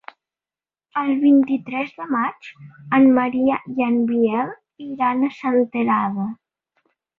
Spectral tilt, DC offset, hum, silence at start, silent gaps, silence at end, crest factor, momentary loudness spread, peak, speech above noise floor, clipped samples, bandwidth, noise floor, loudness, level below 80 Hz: -8.5 dB/octave; under 0.1%; none; 0.95 s; none; 0.85 s; 16 dB; 14 LU; -4 dBFS; over 71 dB; under 0.1%; 4.3 kHz; under -90 dBFS; -20 LUFS; -64 dBFS